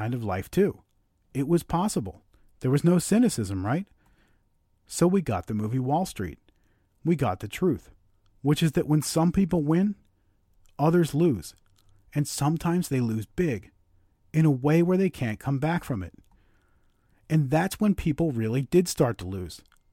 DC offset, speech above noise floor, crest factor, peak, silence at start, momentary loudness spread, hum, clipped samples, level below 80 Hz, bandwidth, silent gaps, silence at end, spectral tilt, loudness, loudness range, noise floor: under 0.1%; 42 dB; 18 dB; -10 dBFS; 0 s; 12 LU; none; under 0.1%; -50 dBFS; 16.5 kHz; none; 0.35 s; -6.5 dB/octave; -26 LUFS; 3 LU; -67 dBFS